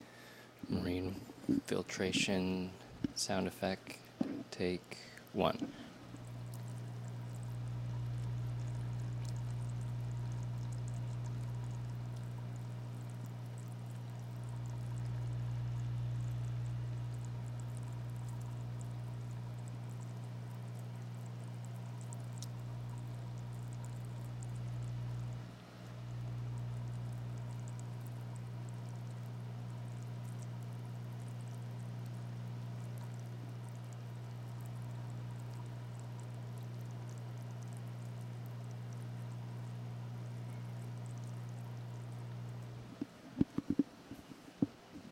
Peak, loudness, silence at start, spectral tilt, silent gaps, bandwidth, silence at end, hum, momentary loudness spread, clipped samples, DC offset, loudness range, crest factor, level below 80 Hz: -16 dBFS; -43 LUFS; 0 s; -6 dB/octave; none; 15 kHz; 0 s; 60 Hz at -45 dBFS; 9 LU; under 0.1%; under 0.1%; 7 LU; 26 dB; -60 dBFS